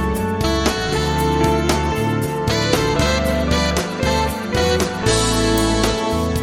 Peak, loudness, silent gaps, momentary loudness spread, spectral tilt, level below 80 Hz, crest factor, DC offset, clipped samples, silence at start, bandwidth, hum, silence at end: 0 dBFS; -18 LUFS; none; 3 LU; -4.5 dB/octave; -28 dBFS; 18 dB; under 0.1%; under 0.1%; 0 s; 17 kHz; none; 0 s